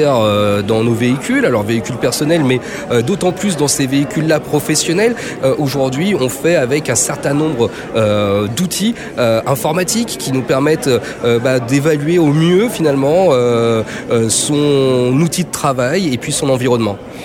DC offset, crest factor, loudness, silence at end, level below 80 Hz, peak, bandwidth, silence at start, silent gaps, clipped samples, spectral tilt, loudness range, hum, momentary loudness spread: under 0.1%; 12 dB; -14 LUFS; 0 s; -46 dBFS; -2 dBFS; 17 kHz; 0 s; none; under 0.1%; -5 dB/octave; 2 LU; none; 4 LU